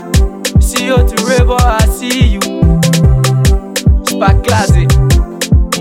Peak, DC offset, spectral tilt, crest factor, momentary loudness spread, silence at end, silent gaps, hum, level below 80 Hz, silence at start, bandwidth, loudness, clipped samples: 0 dBFS; under 0.1%; -5.5 dB/octave; 10 dB; 3 LU; 0 s; none; none; -12 dBFS; 0 s; 16.5 kHz; -11 LUFS; under 0.1%